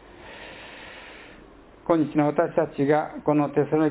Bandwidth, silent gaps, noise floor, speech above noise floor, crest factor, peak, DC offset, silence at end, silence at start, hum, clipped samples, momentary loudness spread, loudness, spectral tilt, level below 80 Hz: 4 kHz; none; -49 dBFS; 27 dB; 18 dB; -6 dBFS; under 0.1%; 0 s; 0.2 s; none; under 0.1%; 19 LU; -23 LUFS; -11.5 dB/octave; -58 dBFS